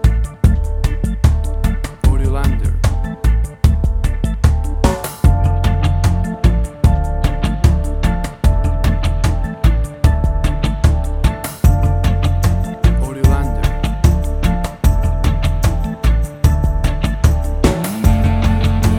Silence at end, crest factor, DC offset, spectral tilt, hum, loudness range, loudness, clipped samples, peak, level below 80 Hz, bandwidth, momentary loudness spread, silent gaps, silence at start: 0 s; 14 dB; under 0.1%; -6.5 dB/octave; none; 1 LU; -17 LUFS; under 0.1%; 0 dBFS; -16 dBFS; 16.5 kHz; 4 LU; none; 0 s